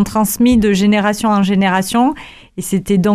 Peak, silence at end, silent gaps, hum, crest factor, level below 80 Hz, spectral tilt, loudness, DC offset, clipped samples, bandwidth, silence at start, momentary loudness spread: -2 dBFS; 0 s; none; none; 10 dB; -38 dBFS; -5.5 dB/octave; -14 LUFS; under 0.1%; under 0.1%; 15.5 kHz; 0 s; 10 LU